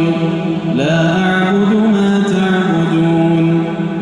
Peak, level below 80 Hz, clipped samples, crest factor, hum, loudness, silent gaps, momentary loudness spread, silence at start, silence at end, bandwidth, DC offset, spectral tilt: -2 dBFS; -48 dBFS; under 0.1%; 10 dB; none; -13 LUFS; none; 4 LU; 0 s; 0 s; 10 kHz; under 0.1%; -7 dB/octave